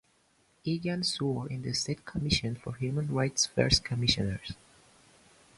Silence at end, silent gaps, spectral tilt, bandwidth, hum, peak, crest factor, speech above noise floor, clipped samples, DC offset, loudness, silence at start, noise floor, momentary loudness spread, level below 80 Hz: 1.05 s; none; -4 dB/octave; 11.5 kHz; none; -10 dBFS; 22 dB; 38 dB; under 0.1%; under 0.1%; -30 LUFS; 0.65 s; -68 dBFS; 11 LU; -48 dBFS